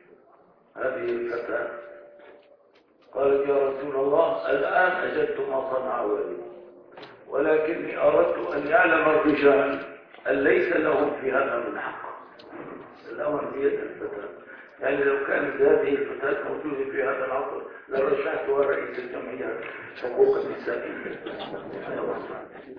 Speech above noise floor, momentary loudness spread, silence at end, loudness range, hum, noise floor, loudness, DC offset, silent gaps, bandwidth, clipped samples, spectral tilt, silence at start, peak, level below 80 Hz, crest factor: 34 dB; 17 LU; 0 s; 7 LU; none; -59 dBFS; -25 LUFS; under 0.1%; none; 5.4 kHz; under 0.1%; -8 dB/octave; 0.75 s; -6 dBFS; -62 dBFS; 20 dB